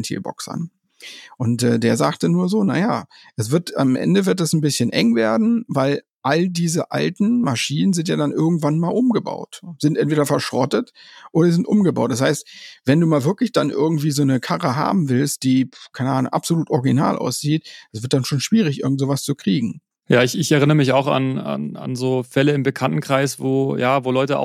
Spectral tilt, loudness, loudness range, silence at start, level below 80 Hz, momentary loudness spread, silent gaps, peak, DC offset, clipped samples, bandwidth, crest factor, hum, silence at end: -6 dB/octave; -19 LUFS; 2 LU; 0 s; -66 dBFS; 10 LU; 6.10-6.20 s; -2 dBFS; under 0.1%; under 0.1%; 15.5 kHz; 16 dB; none; 0 s